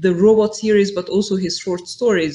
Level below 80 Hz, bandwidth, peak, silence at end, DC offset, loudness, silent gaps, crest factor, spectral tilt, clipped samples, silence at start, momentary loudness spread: -54 dBFS; 10.5 kHz; -2 dBFS; 0 s; under 0.1%; -17 LUFS; none; 14 dB; -5.5 dB/octave; under 0.1%; 0 s; 8 LU